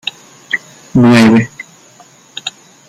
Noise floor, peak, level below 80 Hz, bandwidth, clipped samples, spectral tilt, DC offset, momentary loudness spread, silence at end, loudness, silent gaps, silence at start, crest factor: -43 dBFS; 0 dBFS; -48 dBFS; 13 kHz; under 0.1%; -6 dB/octave; under 0.1%; 23 LU; 0.4 s; -11 LUFS; none; 0.05 s; 12 dB